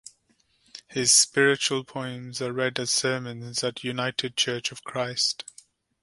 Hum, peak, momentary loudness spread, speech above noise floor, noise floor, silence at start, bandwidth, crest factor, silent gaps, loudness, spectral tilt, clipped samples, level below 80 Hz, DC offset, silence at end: none; -6 dBFS; 16 LU; 41 dB; -67 dBFS; 0.75 s; 12 kHz; 22 dB; none; -24 LUFS; -2 dB/octave; under 0.1%; -68 dBFS; under 0.1%; 0.6 s